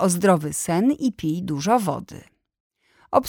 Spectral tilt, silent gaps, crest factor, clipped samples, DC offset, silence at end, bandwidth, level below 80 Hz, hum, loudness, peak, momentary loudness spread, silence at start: -5.5 dB/octave; 2.60-2.70 s; 20 dB; under 0.1%; under 0.1%; 0 s; 19.5 kHz; -56 dBFS; none; -22 LUFS; -4 dBFS; 9 LU; 0 s